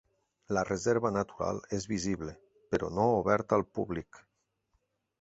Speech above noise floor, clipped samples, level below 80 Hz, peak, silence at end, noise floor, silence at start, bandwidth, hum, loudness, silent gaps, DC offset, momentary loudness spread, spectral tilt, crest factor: 46 dB; under 0.1%; -56 dBFS; -10 dBFS; 1.05 s; -77 dBFS; 0.5 s; 8.2 kHz; none; -32 LUFS; none; under 0.1%; 9 LU; -6 dB/octave; 22 dB